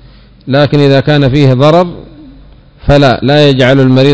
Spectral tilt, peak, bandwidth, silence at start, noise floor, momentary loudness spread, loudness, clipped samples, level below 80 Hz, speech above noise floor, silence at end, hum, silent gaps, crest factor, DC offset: -7.5 dB/octave; 0 dBFS; 8 kHz; 0.45 s; -36 dBFS; 5 LU; -7 LUFS; 6%; -30 dBFS; 30 dB; 0 s; none; none; 8 dB; under 0.1%